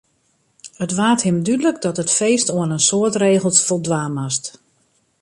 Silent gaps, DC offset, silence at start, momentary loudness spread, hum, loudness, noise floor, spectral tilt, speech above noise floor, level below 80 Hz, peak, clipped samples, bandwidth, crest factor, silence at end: none; under 0.1%; 0.65 s; 8 LU; none; -17 LUFS; -63 dBFS; -4 dB/octave; 46 dB; -60 dBFS; 0 dBFS; under 0.1%; 11.5 kHz; 18 dB; 0.7 s